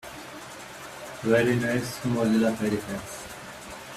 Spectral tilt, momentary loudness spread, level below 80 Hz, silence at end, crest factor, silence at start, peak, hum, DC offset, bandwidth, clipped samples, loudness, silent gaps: -5.5 dB/octave; 17 LU; -56 dBFS; 0 s; 18 dB; 0.05 s; -10 dBFS; none; under 0.1%; 15 kHz; under 0.1%; -26 LUFS; none